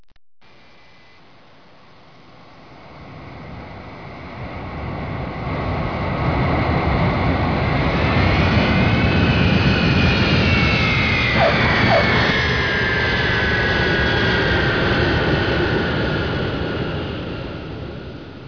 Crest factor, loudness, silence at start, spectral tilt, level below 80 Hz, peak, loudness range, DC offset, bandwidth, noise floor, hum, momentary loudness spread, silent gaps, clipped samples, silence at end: 16 dB; -18 LUFS; 2.7 s; -6.5 dB/octave; -30 dBFS; -4 dBFS; 14 LU; 0.4%; 5.4 kHz; -49 dBFS; none; 17 LU; none; under 0.1%; 0 s